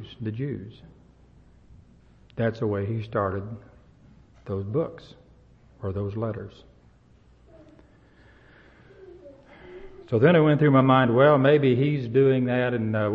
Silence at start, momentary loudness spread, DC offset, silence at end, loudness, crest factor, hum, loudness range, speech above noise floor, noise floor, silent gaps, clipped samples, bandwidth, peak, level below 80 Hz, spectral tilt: 0 s; 22 LU; under 0.1%; 0 s; -23 LUFS; 20 dB; none; 17 LU; 34 dB; -56 dBFS; none; under 0.1%; 5.4 kHz; -6 dBFS; -56 dBFS; -9.5 dB/octave